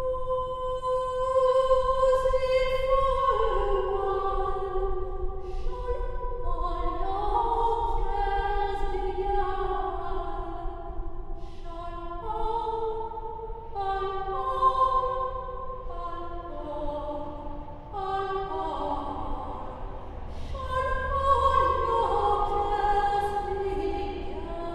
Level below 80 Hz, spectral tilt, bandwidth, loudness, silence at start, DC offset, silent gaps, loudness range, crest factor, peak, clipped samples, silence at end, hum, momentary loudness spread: -34 dBFS; -6.5 dB/octave; 9.6 kHz; -28 LUFS; 0 s; under 0.1%; none; 9 LU; 16 dB; -10 dBFS; under 0.1%; 0 s; none; 15 LU